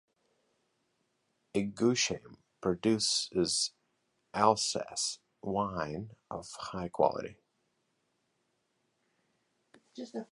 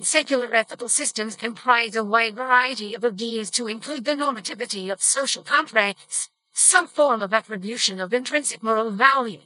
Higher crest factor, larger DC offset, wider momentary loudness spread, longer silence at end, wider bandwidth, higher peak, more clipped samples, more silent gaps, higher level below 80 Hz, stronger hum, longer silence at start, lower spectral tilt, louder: about the same, 26 dB vs 22 dB; neither; first, 15 LU vs 10 LU; about the same, 0.1 s vs 0.1 s; about the same, 11.5 kHz vs 11 kHz; second, -10 dBFS vs 0 dBFS; neither; neither; first, -66 dBFS vs under -90 dBFS; neither; first, 1.55 s vs 0 s; first, -3.5 dB/octave vs -1 dB/octave; second, -32 LUFS vs -21 LUFS